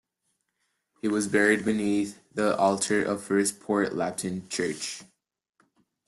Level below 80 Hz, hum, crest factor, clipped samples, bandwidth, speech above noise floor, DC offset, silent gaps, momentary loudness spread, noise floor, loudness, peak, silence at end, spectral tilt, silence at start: -68 dBFS; none; 20 dB; under 0.1%; 12.5 kHz; 51 dB; under 0.1%; none; 10 LU; -78 dBFS; -27 LUFS; -8 dBFS; 1.05 s; -4 dB/octave; 1.05 s